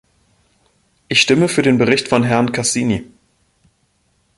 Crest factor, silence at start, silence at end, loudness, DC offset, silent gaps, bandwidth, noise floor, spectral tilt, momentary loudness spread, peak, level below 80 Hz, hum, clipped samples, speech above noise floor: 18 dB; 1.1 s; 1.35 s; -15 LUFS; under 0.1%; none; 11.5 kHz; -62 dBFS; -4 dB/octave; 6 LU; 0 dBFS; -50 dBFS; none; under 0.1%; 47 dB